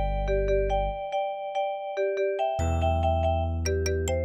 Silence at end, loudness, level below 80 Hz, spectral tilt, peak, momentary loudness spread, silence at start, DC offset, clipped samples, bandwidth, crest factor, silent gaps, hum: 0 s; -27 LUFS; -34 dBFS; -6 dB/octave; -14 dBFS; 5 LU; 0 s; under 0.1%; under 0.1%; 14.5 kHz; 12 dB; none; none